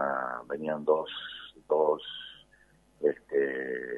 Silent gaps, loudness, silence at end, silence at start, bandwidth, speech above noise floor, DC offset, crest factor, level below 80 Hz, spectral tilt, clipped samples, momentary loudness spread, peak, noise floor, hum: none; -31 LUFS; 0 s; 0 s; 4.1 kHz; 33 dB; under 0.1%; 20 dB; -70 dBFS; -6 dB/octave; under 0.1%; 14 LU; -12 dBFS; -63 dBFS; none